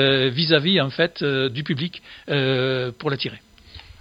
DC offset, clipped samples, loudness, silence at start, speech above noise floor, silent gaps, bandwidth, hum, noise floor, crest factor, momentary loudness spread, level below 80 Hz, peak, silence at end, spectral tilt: under 0.1%; under 0.1%; -21 LUFS; 0 s; 23 dB; none; 7.4 kHz; none; -44 dBFS; 22 dB; 10 LU; -56 dBFS; 0 dBFS; 0.1 s; -7 dB/octave